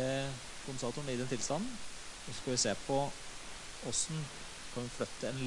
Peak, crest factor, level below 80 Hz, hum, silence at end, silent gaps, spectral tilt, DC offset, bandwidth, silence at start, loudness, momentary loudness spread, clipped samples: -20 dBFS; 18 dB; -56 dBFS; none; 0 s; none; -3.5 dB/octave; under 0.1%; 11.5 kHz; 0 s; -38 LUFS; 13 LU; under 0.1%